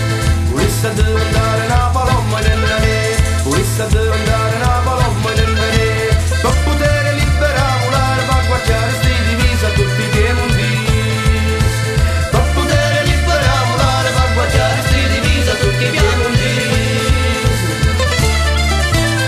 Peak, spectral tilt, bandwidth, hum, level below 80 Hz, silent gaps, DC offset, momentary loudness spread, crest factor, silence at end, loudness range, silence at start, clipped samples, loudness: 0 dBFS; -5 dB/octave; 14 kHz; none; -20 dBFS; none; under 0.1%; 2 LU; 14 dB; 0 s; 1 LU; 0 s; under 0.1%; -14 LUFS